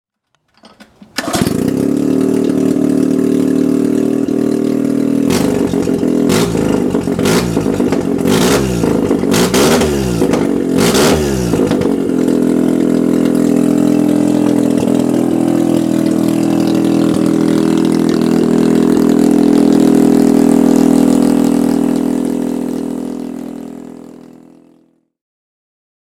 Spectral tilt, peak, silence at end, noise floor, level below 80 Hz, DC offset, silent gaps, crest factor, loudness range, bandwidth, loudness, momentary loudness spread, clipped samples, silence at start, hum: -6 dB/octave; 0 dBFS; 1.95 s; -64 dBFS; -38 dBFS; under 0.1%; none; 12 dB; 5 LU; 17 kHz; -12 LUFS; 6 LU; under 0.1%; 0.8 s; none